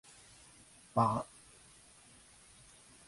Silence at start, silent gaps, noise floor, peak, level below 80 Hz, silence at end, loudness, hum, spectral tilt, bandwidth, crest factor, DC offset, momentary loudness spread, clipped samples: 0.95 s; none; -61 dBFS; -16 dBFS; -68 dBFS; 1.85 s; -34 LUFS; none; -6.5 dB/octave; 11.5 kHz; 24 dB; under 0.1%; 26 LU; under 0.1%